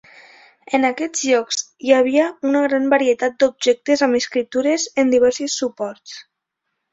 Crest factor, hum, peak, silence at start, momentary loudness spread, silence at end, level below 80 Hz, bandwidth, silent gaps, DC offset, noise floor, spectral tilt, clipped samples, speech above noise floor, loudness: 18 dB; none; -2 dBFS; 0.7 s; 9 LU; 0.7 s; -62 dBFS; 8 kHz; none; under 0.1%; -77 dBFS; -2 dB/octave; under 0.1%; 59 dB; -18 LUFS